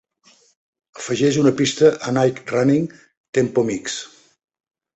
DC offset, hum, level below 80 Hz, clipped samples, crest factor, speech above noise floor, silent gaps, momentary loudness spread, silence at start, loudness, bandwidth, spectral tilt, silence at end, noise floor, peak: under 0.1%; none; -60 dBFS; under 0.1%; 18 dB; 38 dB; 3.17-3.33 s; 13 LU; 0.95 s; -19 LUFS; 8.2 kHz; -5.5 dB/octave; 0.9 s; -56 dBFS; -2 dBFS